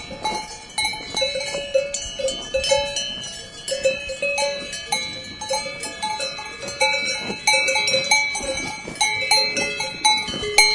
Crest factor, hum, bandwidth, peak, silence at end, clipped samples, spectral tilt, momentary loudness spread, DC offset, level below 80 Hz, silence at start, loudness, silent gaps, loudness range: 22 dB; none; 11.5 kHz; 0 dBFS; 0 s; under 0.1%; -0.5 dB/octave; 12 LU; under 0.1%; -48 dBFS; 0 s; -21 LUFS; none; 6 LU